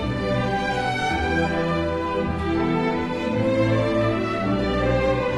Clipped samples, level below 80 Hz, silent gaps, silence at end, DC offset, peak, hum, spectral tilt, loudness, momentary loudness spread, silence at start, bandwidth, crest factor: under 0.1%; -36 dBFS; none; 0 s; under 0.1%; -8 dBFS; none; -7 dB/octave; -23 LUFS; 4 LU; 0 s; 12 kHz; 14 dB